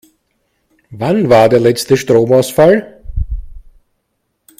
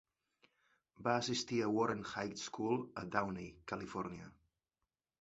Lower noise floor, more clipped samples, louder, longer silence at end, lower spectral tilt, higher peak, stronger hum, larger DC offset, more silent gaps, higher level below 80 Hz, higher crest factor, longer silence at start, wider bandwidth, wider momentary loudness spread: second, -68 dBFS vs under -90 dBFS; first, 0.1% vs under 0.1%; first, -11 LUFS vs -39 LUFS; about the same, 1 s vs 0.9 s; first, -6 dB/octave vs -4 dB/octave; first, 0 dBFS vs -18 dBFS; neither; neither; neither; first, -30 dBFS vs -70 dBFS; second, 14 dB vs 24 dB; about the same, 0.9 s vs 1 s; first, 16 kHz vs 8 kHz; first, 16 LU vs 11 LU